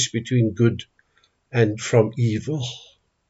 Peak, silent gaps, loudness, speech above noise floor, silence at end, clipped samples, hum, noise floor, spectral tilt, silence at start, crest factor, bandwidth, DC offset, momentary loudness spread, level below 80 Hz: -4 dBFS; none; -22 LUFS; 43 dB; 0.5 s; under 0.1%; none; -64 dBFS; -5.5 dB/octave; 0 s; 18 dB; 8 kHz; under 0.1%; 12 LU; -60 dBFS